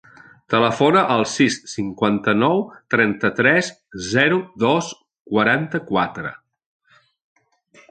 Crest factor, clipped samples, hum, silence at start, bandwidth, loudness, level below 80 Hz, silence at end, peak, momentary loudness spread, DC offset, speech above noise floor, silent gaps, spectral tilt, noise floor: 18 dB; under 0.1%; none; 0.5 s; 9.4 kHz; -19 LUFS; -58 dBFS; 1.55 s; -2 dBFS; 10 LU; under 0.1%; 35 dB; 5.20-5.25 s; -5 dB/octave; -53 dBFS